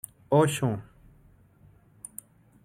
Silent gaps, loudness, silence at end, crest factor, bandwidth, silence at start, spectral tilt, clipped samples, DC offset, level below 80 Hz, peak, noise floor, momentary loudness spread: none; -26 LUFS; 1.8 s; 20 dB; 16 kHz; 0.3 s; -6 dB/octave; under 0.1%; under 0.1%; -62 dBFS; -10 dBFS; -58 dBFS; 22 LU